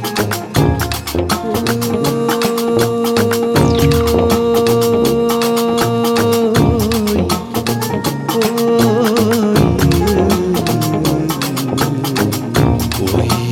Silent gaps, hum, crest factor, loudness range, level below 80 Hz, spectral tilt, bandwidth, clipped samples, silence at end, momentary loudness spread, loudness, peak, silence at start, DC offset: none; none; 14 dB; 2 LU; -32 dBFS; -5.5 dB/octave; 17.5 kHz; under 0.1%; 0 s; 5 LU; -14 LUFS; 0 dBFS; 0 s; under 0.1%